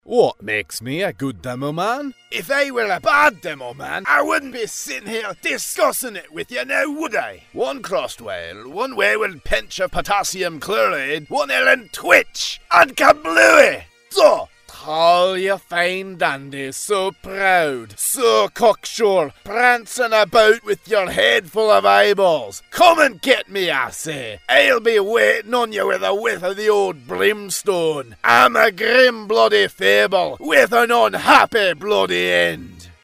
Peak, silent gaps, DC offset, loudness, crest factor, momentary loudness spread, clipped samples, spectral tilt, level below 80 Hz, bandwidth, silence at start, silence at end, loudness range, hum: 0 dBFS; none; under 0.1%; -17 LUFS; 18 dB; 13 LU; under 0.1%; -2.5 dB/octave; -46 dBFS; 16 kHz; 0.1 s; 0.15 s; 7 LU; none